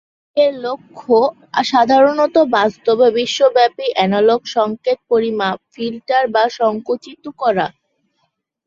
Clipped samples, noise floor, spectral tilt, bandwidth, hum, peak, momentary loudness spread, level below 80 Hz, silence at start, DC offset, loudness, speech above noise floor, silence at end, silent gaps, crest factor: under 0.1%; -68 dBFS; -4.5 dB/octave; 7.6 kHz; none; -2 dBFS; 11 LU; -62 dBFS; 0.35 s; under 0.1%; -16 LUFS; 53 dB; 0.95 s; none; 14 dB